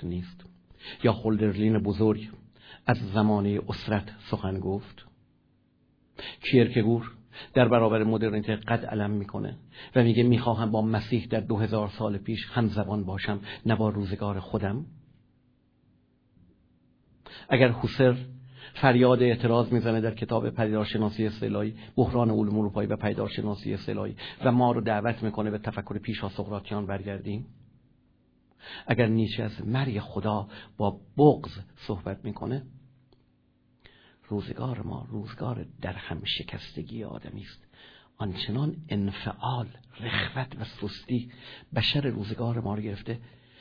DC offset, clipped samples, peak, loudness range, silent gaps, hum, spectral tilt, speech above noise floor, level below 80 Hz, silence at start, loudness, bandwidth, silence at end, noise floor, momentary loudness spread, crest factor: under 0.1%; under 0.1%; -4 dBFS; 10 LU; none; none; -9 dB/octave; 39 dB; -54 dBFS; 0 s; -28 LUFS; 5.4 kHz; 0.35 s; -66 dBFS; 15 LU; 24 dB